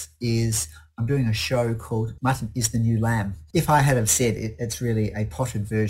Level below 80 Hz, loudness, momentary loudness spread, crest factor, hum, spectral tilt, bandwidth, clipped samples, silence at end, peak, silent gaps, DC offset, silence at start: -42 dBFS; -24 LUFS; 9 LU; 18 dB; none; -5 dB/octave; 16 kHz; under 0.1%; 0 s; -6 dBFS; none; under 0.1%; 0 s